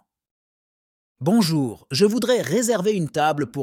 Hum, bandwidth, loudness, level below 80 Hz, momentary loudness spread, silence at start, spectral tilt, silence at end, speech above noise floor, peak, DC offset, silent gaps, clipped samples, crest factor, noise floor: none; 16.5 kHz; -21 LUFS; -64 dBFS; 5 LU; 1.2 s; -5 dB/octave; 0 s; over 70 dB; -6 dBFS; under 0.1%; none; under 0.1%; 16 dB; under -90 dBFS